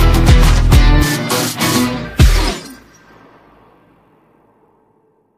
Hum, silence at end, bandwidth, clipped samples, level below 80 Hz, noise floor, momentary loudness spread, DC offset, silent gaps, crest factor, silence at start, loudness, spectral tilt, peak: none; 2.65 s; 15.5 kHz; under 0.1%; -16 dBFS; -56 dBFS; 9 LU; under 0.1%; none; 14 dB; 0 s; -13 LUFS; -5 dB/octave; 0 dBFS